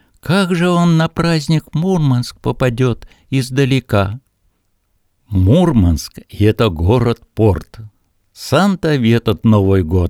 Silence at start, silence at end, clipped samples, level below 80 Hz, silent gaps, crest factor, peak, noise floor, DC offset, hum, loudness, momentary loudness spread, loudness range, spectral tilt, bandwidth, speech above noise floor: 0.25 s; 0 s; under 0.1%; -32 dBFS; none; 14 dB; 0 dBFS; -62 dBFS; under 0.1%; none; -15 LUFS; 9 LU; 2 LU; -7 dB/octave; 16 kHz; 49 dB